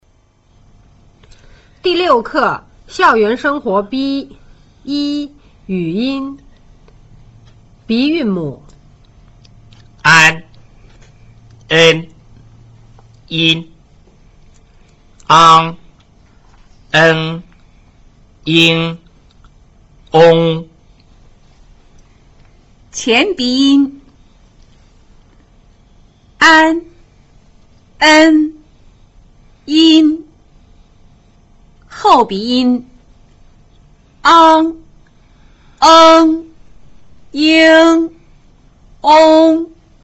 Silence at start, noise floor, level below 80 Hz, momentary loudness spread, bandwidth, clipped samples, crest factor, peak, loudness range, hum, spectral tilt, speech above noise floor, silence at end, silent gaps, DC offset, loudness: 1.85 s; -52 dBFS; -46 dBFS; 16 LU; 8.2 kHz; under 0.1%; 14 dB; 0 dBFS; 10 LU; none; -4.5 dB/octave; 42 dB; 0.4 s; none; under 0.1%; -10 LUFS